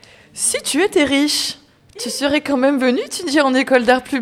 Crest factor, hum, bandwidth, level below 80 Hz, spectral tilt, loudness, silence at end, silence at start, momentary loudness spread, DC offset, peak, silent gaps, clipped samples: 18 dB; none; 16 kHz; -54 dBFS; -2 dB/octave; -16 LUFS; 0 s; 0.35 s; 10 LU; under 0.1%; 0 dBFS; none; under 0.1%